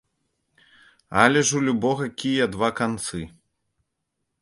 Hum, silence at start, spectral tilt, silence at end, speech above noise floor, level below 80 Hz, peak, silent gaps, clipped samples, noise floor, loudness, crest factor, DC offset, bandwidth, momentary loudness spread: none; 1.1 s; -4 dB/octave; 1.15 s; 56 dB; -54 dBFS; 0 dBFS; none; under 0.1%; -79 dBFS; -22 LUFS; 24 dB; under 0.1%; 11.5 kHz; 13 LU